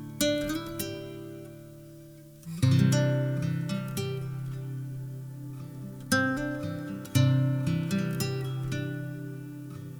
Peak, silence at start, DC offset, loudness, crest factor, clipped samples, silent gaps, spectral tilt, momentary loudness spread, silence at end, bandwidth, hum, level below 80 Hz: -10 dBFS; 0 s; under 0.1%; -30 LUFS; 20 dB; under 0.1%; none; -6 dB/octave; 18 LU; 0 s; over 20 kHz; none; -56 dBFS